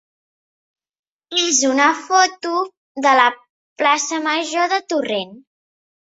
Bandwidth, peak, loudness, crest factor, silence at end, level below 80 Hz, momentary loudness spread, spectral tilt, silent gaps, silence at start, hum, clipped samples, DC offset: 8 kHz; -2 dBFS; -17 LUFS; 18 dB; 0.75 s; -72 dBFS; 10 LU; -0.5 dB/octave; 2.77-2.95 s, 3.50-3.76 s; 1.3 s; none; under 0.1%; under 0.1%